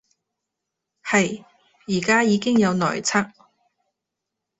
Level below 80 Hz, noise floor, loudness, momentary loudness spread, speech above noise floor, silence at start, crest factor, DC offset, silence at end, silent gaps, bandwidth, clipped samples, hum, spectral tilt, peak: -62 dBFS; -83 dBFS; -20 LUFS; 17 LU; 63 dB; 1.05 s; 22 dB; under 0.1%; 1.3 s; none; 8.4 kHz; under 0.1%; none; -4.5 dB/octave; -2 dBFS